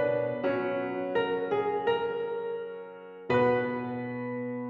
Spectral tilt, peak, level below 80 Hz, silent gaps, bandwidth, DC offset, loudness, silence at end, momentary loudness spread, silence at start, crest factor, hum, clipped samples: -8 dB/octave; -14 dBFS; -68 dBFS; none; 5.4 kHz; under 0.1%; -30 LUFS; 0 s; 11 LU; 0 s; 16 dB; none; under 0.1%